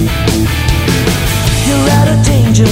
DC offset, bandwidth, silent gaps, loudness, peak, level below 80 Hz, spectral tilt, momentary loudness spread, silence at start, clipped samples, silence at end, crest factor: under 0.1%; 16.5 kHz; none; -11 LUFS; 0 dBFS; -18 dBFS; -5 dB/octave; 3 LU; 0 s; under 0.1%; 0 s; 10 dB